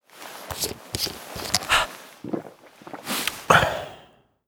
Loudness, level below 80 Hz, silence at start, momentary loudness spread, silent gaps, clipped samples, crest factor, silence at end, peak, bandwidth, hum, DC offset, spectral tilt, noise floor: -24 LUFS; -50 dBFS; 0.15 s; 21 LU; none; under 0.1%; 28 dB; 0.4 s; 0 dBFS; over 20 kHz; none; under 0.1%; -2.5 dB/octave; -54 dBFS